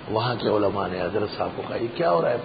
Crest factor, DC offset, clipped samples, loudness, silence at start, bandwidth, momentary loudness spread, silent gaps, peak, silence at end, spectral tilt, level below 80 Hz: 16 dB; under 0.1%; under 0.1%; -25 LUFS; 0 s; 5 kHz; 7 LU; none; -8 dBFS; 0 s; -11 dB/octave; -52 dBFS